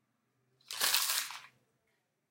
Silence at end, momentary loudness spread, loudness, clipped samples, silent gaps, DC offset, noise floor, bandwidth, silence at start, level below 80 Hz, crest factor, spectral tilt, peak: 0.85 s; 17 LU; -31 LUFS; under 0.1%; none; under 0.1%; -80 dBFS; 17 kHz; 0.7 s; under -90 dBFS; 28 dB; 3 dB/octave; -10 dBFS